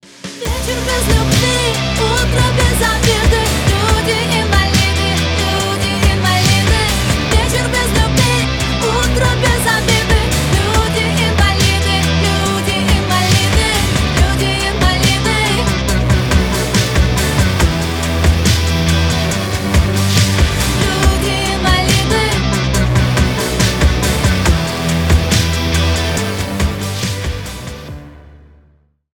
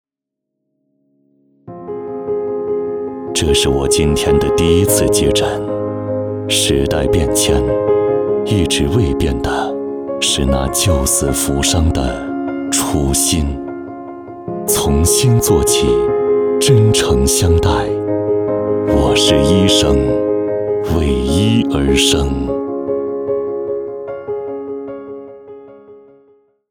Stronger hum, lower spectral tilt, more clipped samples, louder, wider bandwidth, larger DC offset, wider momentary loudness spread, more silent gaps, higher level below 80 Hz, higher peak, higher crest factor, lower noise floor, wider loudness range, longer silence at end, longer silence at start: neither; about the same, -4 dB/octave vs -4.5 dB/octave; neither; about the same, -13 LUFS vs -15 LUFS; about the same, 19 kHz vs over 20 kHz; neither; second, 5 LU vs 13 LU; neither; first, -20 dBFS vs -26 dBFS; about the same, 0 dBFS vs 0 dBFS; about the same, 12 dB vs 16 dB; second, -53 dBFS vs -80 dBFS; second, 1 LU vs 7 LU; first, 0.85 s vs 0.7 s; second, 0.25 s vs 1.65 s